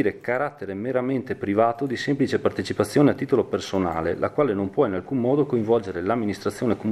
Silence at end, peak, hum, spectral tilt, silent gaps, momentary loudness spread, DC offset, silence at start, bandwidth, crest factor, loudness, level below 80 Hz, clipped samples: 0 s; -6 dBFS; none; -7 dB/octave; none; 6 LU; under 0.1%; 0 s; 14 kHz; 18 dB; -24 LUFS; -56 dBFS; under 0.1%